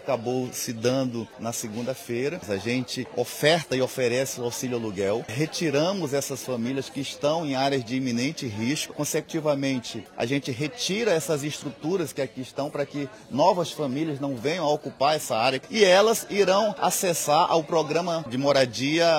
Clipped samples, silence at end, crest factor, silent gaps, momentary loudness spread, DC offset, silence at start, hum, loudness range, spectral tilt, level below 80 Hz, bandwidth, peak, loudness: under 0.1%; 0 s; 20 dB; none; 9 LU; under 0.1%; 0 s; none; 6 LU; -4 dB/octave; -66 dBFS; 19 kHz; -6 dBFS; -25 LUFS